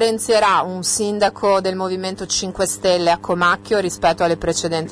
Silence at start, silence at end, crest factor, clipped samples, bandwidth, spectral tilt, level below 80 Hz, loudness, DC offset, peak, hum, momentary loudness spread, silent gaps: 0 s; 0 s; 12 dB; under 0.1%; 11 kHz; -3 dB/octave; -46 dBFS; -18 LUFS; under 0.1%; -6 dBFS; none; 5 LU; none